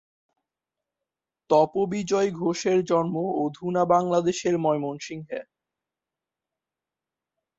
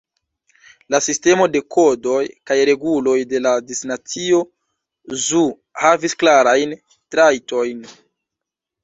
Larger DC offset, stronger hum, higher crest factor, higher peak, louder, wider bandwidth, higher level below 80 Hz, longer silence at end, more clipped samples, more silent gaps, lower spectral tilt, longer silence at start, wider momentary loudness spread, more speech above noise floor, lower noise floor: neither; neither; about the same, 20 dB vs 16 dB; second, -8 dBFS vs -2 dBFS; second, -24 LUFS vs -17 LUFS; about the same, 8 kHz vs 8 kHz; second, -68 dBFS vs -62 dBFS; first, 2.15 s vs 0.95 s; neither; neither; first, -6 dB/octave vs -3 dB/octave; first, 1.5 s vs 0.9 s; about the same, 13 LU vs 11 LU; about the same, 65 dB vs 68 dB; first, -89 dBFS vs -84 dBFS